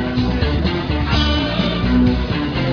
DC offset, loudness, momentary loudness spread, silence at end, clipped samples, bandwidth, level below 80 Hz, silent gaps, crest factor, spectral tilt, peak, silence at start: under 0.1%; -18 LUFS; 4 LU; 0 s; under 0.1%; 5.4 kHz; -24 dBFS; none; 14 dB; -7 dB/octave; -2 dBFS; 0 s